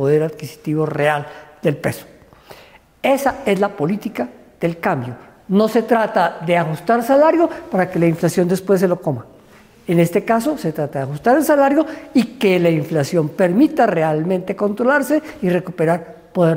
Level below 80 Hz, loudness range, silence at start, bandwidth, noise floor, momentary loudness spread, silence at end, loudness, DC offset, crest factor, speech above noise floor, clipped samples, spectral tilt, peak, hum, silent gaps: -54 dBFS; 5 LU; 0 s; 16 kHz; -46 dBFS; 10 LU; 0 s; -17 LUFS; under 0.1%; 14 dB; 30 dB; under 0.1%; -6.5 dB/octave; -4 dBFS; none; none